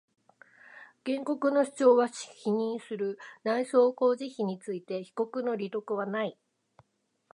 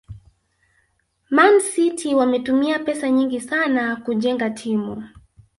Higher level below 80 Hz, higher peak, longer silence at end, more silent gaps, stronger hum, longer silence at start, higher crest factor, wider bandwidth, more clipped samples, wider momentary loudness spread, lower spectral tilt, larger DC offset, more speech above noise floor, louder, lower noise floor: second, -86 dBFS vs -56 dBFS; second, -10 dBFS vs -2 dBFS; first, 1 s vs 0.5 s; neither; neither; first, 0.7 s vs 0.1 s; about the same, 20 dB vs 20 dB; about the same, 11 kHz vs 11.5 kHz; neither; about the same, 12 LU vs 10 LU; first, -5.5 dB/octave vs -4 dB/octave; neither; second, 42 dB vs 48 dB; second, -29 LUFS vs -19 LUFS; first, -71 dBFS vs -66 dBFS